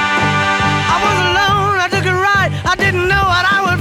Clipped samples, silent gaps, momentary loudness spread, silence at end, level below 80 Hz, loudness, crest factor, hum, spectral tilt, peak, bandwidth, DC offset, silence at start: under 0.1%; none; 2 LU; 0 s; -34 dBFS; -13 LUFS; 12 dB; none; -4.5 dB/octave; -2 dBFS; 16 kHz; under 0.1%; 0 s